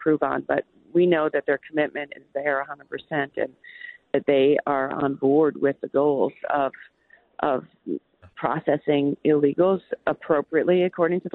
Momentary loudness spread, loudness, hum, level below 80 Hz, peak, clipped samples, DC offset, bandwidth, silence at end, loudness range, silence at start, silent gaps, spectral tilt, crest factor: 12 LU; -24 LUFS; none; -66 dBFS; -8 dBFS; under 0.1%; under 0.1%; 4.1 kHz; 0.05 s; 4 LU; 0 s; none; -10.5 dB/octave; 16 dB